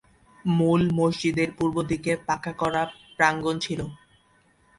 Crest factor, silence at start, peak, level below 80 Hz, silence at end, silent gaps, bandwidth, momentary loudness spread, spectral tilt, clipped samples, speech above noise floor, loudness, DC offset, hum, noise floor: 20 dB; 0.45 s; -4 dBFS; -54 dBFS; 0.8 s; none; 11.5 kHz; 10 LU; -6 dB/octave; under 0.1%; 38 dB; -25 LUFS; under 0.1%; none; -62 dBFS